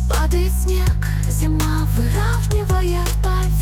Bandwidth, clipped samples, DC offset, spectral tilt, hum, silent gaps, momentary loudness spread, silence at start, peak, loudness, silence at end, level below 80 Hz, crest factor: 17 kHz; under 0.1%; under 0.1%; -5.5 dB/octave; none; none; 2 LU; 0 s; -8 dBFS; -19 LUFS; 0 s; -18 dBFS; 8 dB